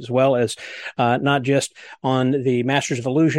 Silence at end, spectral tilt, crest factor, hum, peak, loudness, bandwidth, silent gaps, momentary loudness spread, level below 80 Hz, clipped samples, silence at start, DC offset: 0 s; -5.5 dB/octave; 16 dB; none; -4 dBFS; -20 LUFS; 12.5 kHz; none; 10 LU; -62 dBFS; under 0.1%; 0 s; under 0.1%